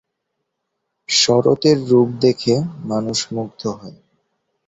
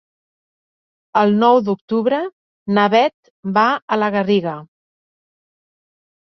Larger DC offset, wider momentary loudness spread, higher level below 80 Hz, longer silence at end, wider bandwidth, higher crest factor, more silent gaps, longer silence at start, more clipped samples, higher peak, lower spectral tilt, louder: neither; about the same, 12 LU vs 14 LU; first, -56 dBFS vs -66 dBFS; second, 0.75 s vs 1.65 s; first, 8 kHz vs 6.2 kHz; about the same, 18 dB vs 18 dB; second, none vs 1.81-1.88 s, 2.32-2.66 s, 3.14-3.23 s, 3.30-3.43 s, 3.82-3.88 s; about the same, 1.1 s vs 1.15 s; neither; about the same, -2 dBFS vs -2 dBFS; second, -4.5 dB/octave vs -7 dB/octave; about the same, -17 LUFS vs -17 LUFS